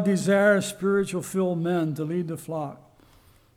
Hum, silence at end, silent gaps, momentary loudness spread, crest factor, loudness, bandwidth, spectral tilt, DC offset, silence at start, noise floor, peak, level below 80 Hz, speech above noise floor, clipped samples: none; 0.8 s; none; 12 LU; 16 dB; -25 LUFS; 16 kHz; -6 dB/octave; under 0.1%; 0 s; -57 dBFS; -10 dBFS; -62 dBFS; 32 dB; under 0.1%